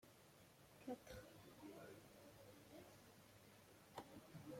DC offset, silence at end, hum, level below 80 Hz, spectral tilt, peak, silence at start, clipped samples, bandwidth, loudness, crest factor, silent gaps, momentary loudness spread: under 0.1%; 0 s; none; -80 dBFS; -5 dB/octave; -38 dBFS; 0 s; under 0.1%; 16.5 kHz; -61 LUFS; 24 dB; none; 12 LU